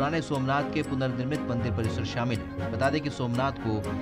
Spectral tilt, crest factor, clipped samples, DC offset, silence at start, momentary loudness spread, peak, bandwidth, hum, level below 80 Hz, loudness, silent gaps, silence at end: -6.5 dB/octave; 16 dB; under 0.1%; under 0.1%; 0 s; 3 LU; -12 dBFS; 15.5 kHz; none; -50 dBFS; -29 LUFS; none; 0 s